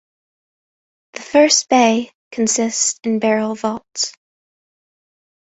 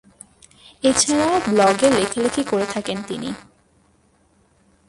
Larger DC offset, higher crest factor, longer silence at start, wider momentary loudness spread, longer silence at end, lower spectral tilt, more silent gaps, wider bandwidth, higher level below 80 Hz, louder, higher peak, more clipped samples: neither; about the same, 18 dB vs 18 dB; first, 1.15 s vs 0.85 s; about the same, 11 LU vs 13 LU; about the same, 1.45 s vs 1.5 s; second, -2 dB/octave vs -3.5 dB/octave; first, 2.15-2.31 s vs none; second, 8.2 kHz vs 11.5 kHz; second, -62 dBFS vs -52 dBFS; first, -16 LUFS vs -19 LUFS; about the same, -2 dBFS vs -2 dBFS; neither